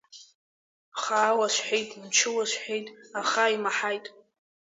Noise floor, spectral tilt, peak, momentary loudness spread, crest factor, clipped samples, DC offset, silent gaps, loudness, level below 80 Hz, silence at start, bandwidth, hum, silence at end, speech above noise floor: under -90 dBFS; -0.5 dB/octave; -8 dBFS; 12 LU; 20 dB; under 0.1%; under 0.1%; 0.35-0.92 s; -26 LUFS; -82 dBFS; 0.15 s; 7.8 kHz; none; 0.55 s; over 63 dB